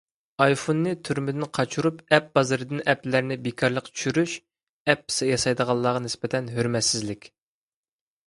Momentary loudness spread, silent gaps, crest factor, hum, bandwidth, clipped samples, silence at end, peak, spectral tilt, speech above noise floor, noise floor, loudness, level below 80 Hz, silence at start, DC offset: 7 LU; 4.63-4.85 s; 24 dB; none; 11.5 kHz; under 0.1%; 1 s; 0 dBFS; -4.5 dB/octave; over 66 dB; under -90 dBFS; -24 LUFS; -60 dBFS; 0.4 s; under 0.1%